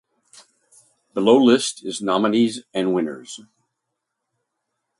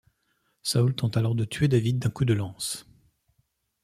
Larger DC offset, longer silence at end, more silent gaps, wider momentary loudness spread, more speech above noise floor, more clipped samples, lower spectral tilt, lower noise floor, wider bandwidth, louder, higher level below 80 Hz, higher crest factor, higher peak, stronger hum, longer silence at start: neither; first, 1.6 s vs 1 s; neither; first, 19 LU vs 9 LU; first, 60 dB vs 48 dB; neither; second, -4.5 dB/octave vs -6 dB/octave; first, -79 dBFS vs -73 dBFS; second, 11.5 kHz vs 14 kHz; first, -19 LUFS vs -26 LUFS; second, -70 dBFS vs -56 dBFS; about the same, 20 dB vs 18 dB; first, -2 dBFS vs -10 dBFS; neither; first, 1.15 s vs 0.65 s